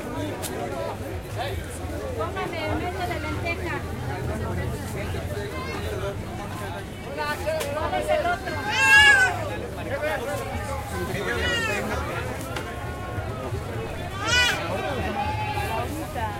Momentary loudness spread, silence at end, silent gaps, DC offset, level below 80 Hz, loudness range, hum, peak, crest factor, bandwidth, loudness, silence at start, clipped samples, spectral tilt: 12 LU; 0 s; none; under 0.1%; -40 dBFS; 10 LU; none; -4 dBFS; 22 dB; 16 kHz; -25 LUFS; 0 s; under 0.1%; -4 dB/octave